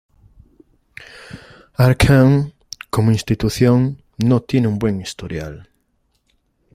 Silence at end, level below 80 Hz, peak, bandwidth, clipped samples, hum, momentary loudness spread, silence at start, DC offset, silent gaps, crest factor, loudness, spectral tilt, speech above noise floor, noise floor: 1.1 s; -38 dBFS; 0 dBFS; 15 kHz; under 0.1%; none; 25 LU; 1 s; under 0.1%; none; 18 dB; -17 LUFS; -7 dB/octave; 50 dB; -65 dBFS